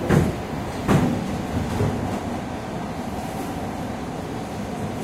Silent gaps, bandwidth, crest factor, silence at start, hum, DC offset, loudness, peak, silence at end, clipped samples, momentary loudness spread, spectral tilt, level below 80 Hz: none; 16 kHz; 22 dB; 0 s; none; under 0.1%; -26 LUFS; -4 dBFS; 0 s; under 0.1%; 10 LU; -6.5 dB/octave; -38 dBFS